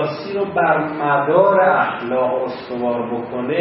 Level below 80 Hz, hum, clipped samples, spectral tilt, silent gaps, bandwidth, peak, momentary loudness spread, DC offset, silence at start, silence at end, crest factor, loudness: -60 dBFS; none; under 0.1%; -11 dB/octave; none; 5.8 kHz; -2 dBFS; 10 LU; under 0.1%; 0 s; 0 s; 16 dB; -18 LUFS